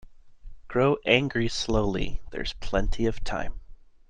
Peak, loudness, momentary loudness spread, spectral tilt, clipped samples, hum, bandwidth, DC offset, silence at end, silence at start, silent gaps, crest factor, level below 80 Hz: -4 dBFS; -27 LUFS; 12 LU; -5 dB/octave; under 0.1%; none; 9.4 kHz; under 0.1%; 0.35 s; 0.05 s; none; 22 dB; -34 dBFS